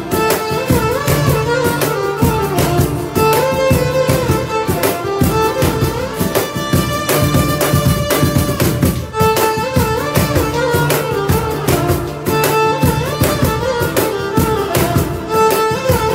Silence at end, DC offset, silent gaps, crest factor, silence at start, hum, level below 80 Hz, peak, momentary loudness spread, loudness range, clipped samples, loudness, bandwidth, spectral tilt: 0 s; under 0.1%; none; 14 dB; 0 s; none; -30 dBFS; 0 dBFS; 3 LU; 1 LU; under 0.1%; -15 LUFS; 16.5 kHz; -5 dB/octave